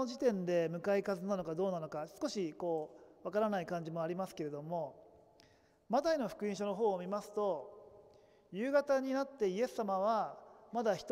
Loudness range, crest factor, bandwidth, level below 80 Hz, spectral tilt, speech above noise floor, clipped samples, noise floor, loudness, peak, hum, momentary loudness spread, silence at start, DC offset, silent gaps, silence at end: 3 LU; 18 dB; 16 kHz; -76 dBFS; -6 dB/octave; 31 dB; under 0.1%; -67 dBFS; -37 LUFS; -18 dBFS; none; 9 LU; 0 s; under 0.1%; none; 0 s